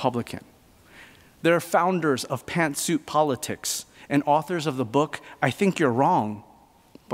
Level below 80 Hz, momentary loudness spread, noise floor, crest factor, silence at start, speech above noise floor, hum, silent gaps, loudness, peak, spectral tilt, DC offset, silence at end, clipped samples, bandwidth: -64 dBFS; 9 LU; -53 dBFS; 20 dB; 0 s; 30 dB; none; none; -24 LUFS; -4 dBFS; -5 dB/octave; under 0.1%; 0 s; under 0.1%; 16 kHz